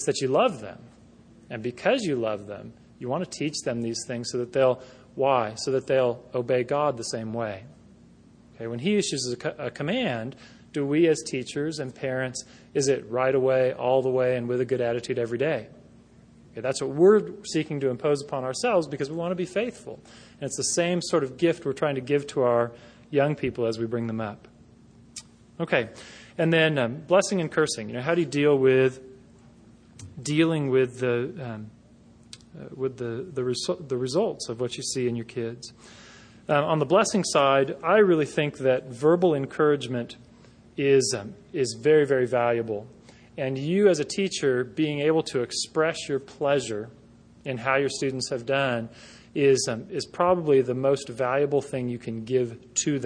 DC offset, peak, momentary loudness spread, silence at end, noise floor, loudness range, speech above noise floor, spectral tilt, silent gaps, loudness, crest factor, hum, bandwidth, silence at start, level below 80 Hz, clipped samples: under 0.1%; -6 dBFS; 14 LU; 0 s; -53 dBFS; 6 LU; 28 dB; -5 dB/octave; none; -25 LUFS; 20 dB; none; 10.5 kHz; 0 s; -64 dBFS; under 0.1%